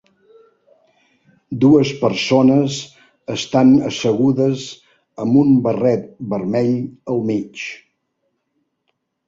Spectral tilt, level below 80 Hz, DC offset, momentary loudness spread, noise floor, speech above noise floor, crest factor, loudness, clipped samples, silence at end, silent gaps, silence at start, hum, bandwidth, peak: -6.5 dB/octave; -56 dBFS; under 0.1%; 16 LU; -71 dBFS; 55 dB; 16 dB; -17 LUFS; under 0.1%; 1.5 s; none; 1.5 s; none; 7.8 kHz; -2 dBFS